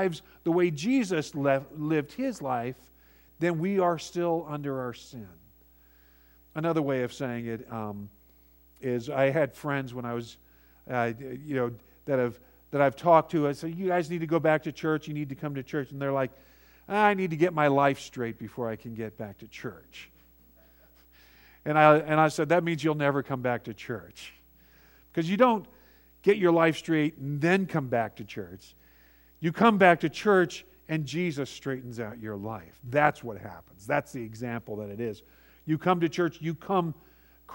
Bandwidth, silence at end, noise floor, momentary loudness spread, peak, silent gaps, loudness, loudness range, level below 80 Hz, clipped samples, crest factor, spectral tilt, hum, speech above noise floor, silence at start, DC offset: 16.5 kHz; 0 s; -59 dBFS; 17 LU; -4 dBFS; none; -28 LUFS; 7 LU; -62 dBFS; under 0.1%; 24 dB; -6.5 dB/octave; none; 31 dB; 0 s; under 0.1%